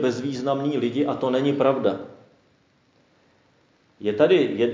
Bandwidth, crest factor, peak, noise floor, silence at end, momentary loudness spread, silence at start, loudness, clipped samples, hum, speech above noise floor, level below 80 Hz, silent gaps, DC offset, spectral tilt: 7.6 kHz; 18 dB; -6 dBFS; -62 dBFS; 0 s; 11 LU; 0 s; -23 LUFS; under 0.1%; none; 40 dB; -68 dBFS; none; under 0.1%; -6.5 dB/octave